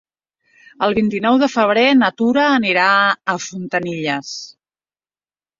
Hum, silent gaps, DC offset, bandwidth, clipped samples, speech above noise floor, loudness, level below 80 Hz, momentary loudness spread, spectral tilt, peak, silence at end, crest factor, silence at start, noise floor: none; none; under 0.1%; 7.6 kHz; under 0.1%; over 74 dB; -16 LUFS; -58 dBFS; 10 LU; -4.5 dB/octave; 0 dBFS; 1.15 s; 16 dB; 0.8 s; under -90 dBFS